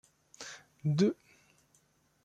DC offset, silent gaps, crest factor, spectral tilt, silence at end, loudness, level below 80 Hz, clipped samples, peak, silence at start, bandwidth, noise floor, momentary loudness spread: under 0.1%; none; 20 dB; -7 dB/octave; 1.1 s; -32 LUFS; -74 dBFS; under 0.1%; -16 dBFS; 0.4 s; 10 kHz; -70 dBFS; 19 LU